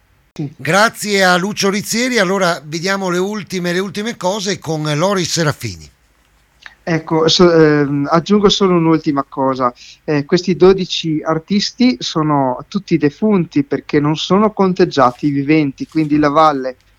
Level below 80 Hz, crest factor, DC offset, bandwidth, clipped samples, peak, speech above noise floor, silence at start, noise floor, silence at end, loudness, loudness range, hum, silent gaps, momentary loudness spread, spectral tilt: -46 dBFS; 14 dB; under 0.1%; 16.5 kHz; under 0.1%; 0 dBFS; 40 dB; 0.4 s; -54 dBFS; 0.25 s; -15 LUFS; 5 LU; none; none; 8 LU; -5 dB/octave